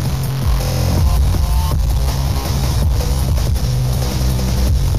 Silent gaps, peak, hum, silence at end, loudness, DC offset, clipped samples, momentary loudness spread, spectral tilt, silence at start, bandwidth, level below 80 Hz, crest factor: none; -4 dBFS; none; 0 s; -17 LUFS; 3%; under 0.1%; 3 LU; -5.5 dB/octave; 0 s; 15.5 kHz; -18 dBFS; 10 dB